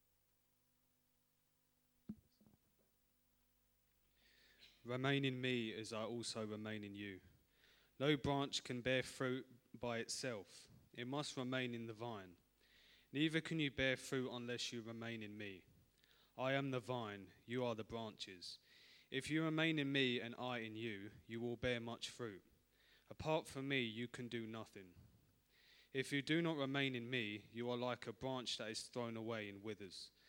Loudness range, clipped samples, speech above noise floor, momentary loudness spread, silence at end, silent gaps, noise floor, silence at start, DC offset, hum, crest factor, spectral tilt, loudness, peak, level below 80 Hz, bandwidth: 4 LU; under 0.1%; 38 dB; 14 LU; 0.2 s; none; -82 dBFS; 2.1 s; under 0.1%; 50 Hz at -80 dBFS; 22 dB; -4.5 dB/octave; -44 LUFS; -24 dBFS; -74 dBFS; 19 kHz